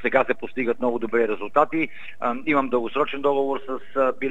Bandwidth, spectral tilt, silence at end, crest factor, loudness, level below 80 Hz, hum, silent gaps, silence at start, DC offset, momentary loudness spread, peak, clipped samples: 8 kHz; -7 dB/octave; 0 s; 20 dB; -24 LUFS; -64 dBFS; none; none; 0.05 s; 2%; 6 LU; -2 dBFS; under 0.1%